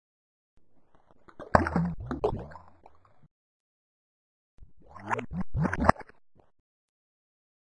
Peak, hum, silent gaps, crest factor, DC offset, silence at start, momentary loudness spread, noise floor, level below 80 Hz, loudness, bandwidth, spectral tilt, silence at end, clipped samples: -2 dBFS; none; 3.31-4.58 s; 32 dB; under 0.1%; 0.55 s; 22 LU; -58 dBFS; -48 dBFS; -29 LUFS; 10.5 kHz; -7.5 dB/octave; 1.75 s; under 0.1%